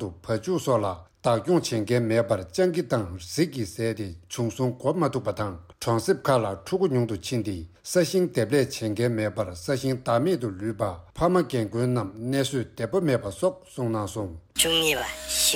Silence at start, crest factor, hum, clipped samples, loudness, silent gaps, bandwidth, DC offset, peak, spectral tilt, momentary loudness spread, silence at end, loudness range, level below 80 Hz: 0 s; 18 dB; none; under 0.1%; -26 LUFS; none; 16.5 kHz; under 0.1%; -8 dBFS; -4.5 dB/octave; 8 LU; 0 s; 2 LU; -52 dBFS